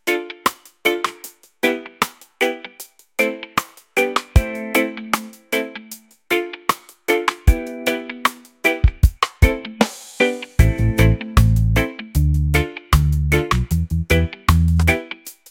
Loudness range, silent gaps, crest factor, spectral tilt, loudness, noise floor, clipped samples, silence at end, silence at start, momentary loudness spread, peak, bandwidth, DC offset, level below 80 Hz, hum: 5 LU; none; 18 dB; -5.5 dB/octave; -20 LUFS; -42 dBFS; under 0.1%; 0.2 s; 0.05 s; 8 LU; 0 dBFS; 17 kHz; under 0.1%; -24 dBFS; none